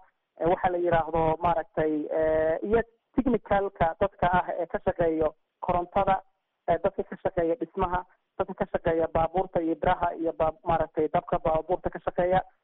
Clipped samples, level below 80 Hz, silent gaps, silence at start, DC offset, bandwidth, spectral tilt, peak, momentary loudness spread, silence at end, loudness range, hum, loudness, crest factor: under 0.1%; -44 dBFS; none; 0.4 s; under 0.1%; 4 kHz; -6 dB/octave; -12 dBFS; 6 LU; 0.2 s; 3 LU; none; -27 LUFS; 16 dB